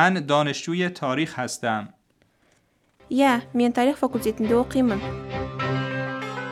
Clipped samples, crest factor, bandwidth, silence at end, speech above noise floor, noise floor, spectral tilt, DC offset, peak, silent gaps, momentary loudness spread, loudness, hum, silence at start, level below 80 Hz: under 0.1%; 20 dB; 14.5 kHz; 0 s; 42 dB; -64 dBFS; -5.5 dB/octave; under 0.1%; -4 dBFS; none; 10 LU; -24 LUFS; none; 0 s; -52 dBFS